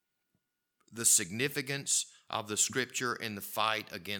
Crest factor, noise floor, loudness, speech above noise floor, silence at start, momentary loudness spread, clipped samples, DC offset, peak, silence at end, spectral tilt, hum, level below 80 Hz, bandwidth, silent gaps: 24 dB; -82 dBFS; -31 LUFS; 49 dB; 0.9 s; 12 LU; under 0.1%; under 0.1%; -10 dBFS; 0 s; -1.5 dB/octave; none; -80 dBFS; 19 kHz; none